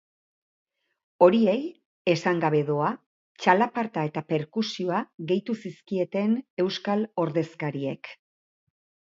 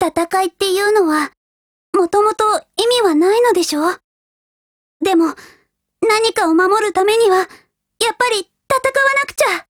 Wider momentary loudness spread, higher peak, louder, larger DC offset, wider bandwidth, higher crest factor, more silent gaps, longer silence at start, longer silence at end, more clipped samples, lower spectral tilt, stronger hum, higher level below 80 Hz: first, 11 LU vs 7 LU; second, -4 dBFS vs 0 dBFS; second, -26 LUFS vs -15 LUFS; neither; second, 7.6 kHz vs 19 kHz; first, 22 dB vs 16 dB; second, 1.85-2.05 s, 3.06-3.35 s, 5.14-5.18 s, 6.50-6.57 s vs 1.37-1.93 s, 4.04-5.00 s; first, 1.2 s vs 0 s; first, 0.95 s vs 0.1 s; neither; first, -6.5 dB/octave vs -2 dB/octave; neither; second, -74 dBFS vs -56 dBFS